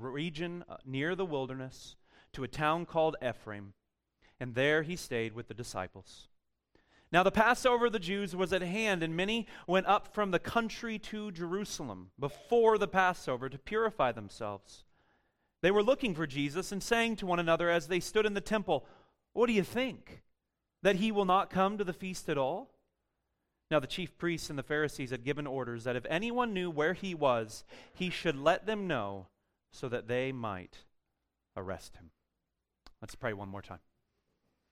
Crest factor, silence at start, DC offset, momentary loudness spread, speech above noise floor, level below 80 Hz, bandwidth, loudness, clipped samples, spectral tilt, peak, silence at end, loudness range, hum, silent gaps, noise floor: 22 dB; 0 s; under 0.1%; 15 LU; 53 dB; -58 dBFS; 16 kHz; -33 LUFS; under 0.1%; -5 dB/octave; -12 dBFS; 0.95 s; 7 LU; none; none; -86 dBFS